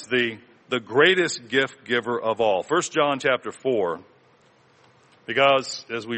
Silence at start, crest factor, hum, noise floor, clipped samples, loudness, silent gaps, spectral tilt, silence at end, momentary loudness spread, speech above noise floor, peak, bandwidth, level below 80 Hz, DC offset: 0 s; 20 dB; none; -58 dBFS; under 0.1%; -22 LUFS; none; -3.5 dB/octave; 0 s; 11 LU; 35 dB; -4 dBFS; 8.8 kHz; -68 dBFS; under 0.1%